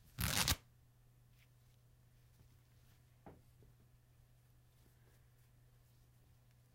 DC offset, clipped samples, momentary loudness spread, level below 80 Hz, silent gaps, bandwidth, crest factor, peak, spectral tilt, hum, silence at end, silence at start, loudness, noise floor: under 0.1%; under 0.1%; 28 LU; -60 dBFS; none; 16 kHz; 34 dB; -14 dBFS; -2 dB/octave; none; 3.4 s; 0.2 s; -37 LUFS; -68 dBFS